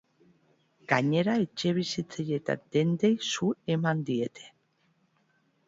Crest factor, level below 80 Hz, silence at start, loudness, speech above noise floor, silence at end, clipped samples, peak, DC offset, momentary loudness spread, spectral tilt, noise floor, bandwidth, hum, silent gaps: 20 dB; -70 dBFS; 0.9 s; -29 LUFS; 42 dB; 1.2 s; under 0.1%; -10 dBFS; under 0.1%; 7 LU; -5.5 dB/octave; -70 dBFS; 7.8 kHz; none; none